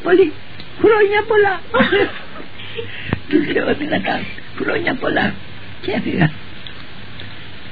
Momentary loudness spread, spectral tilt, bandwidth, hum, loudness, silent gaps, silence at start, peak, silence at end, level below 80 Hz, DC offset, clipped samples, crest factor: 20 LU; -9 dB/octave; 5 kHz; none; -17 LUFS; none; 0 s; 0 dBFS; 0 s; -46 dBFS; 4%; under 0.1%; 18 dB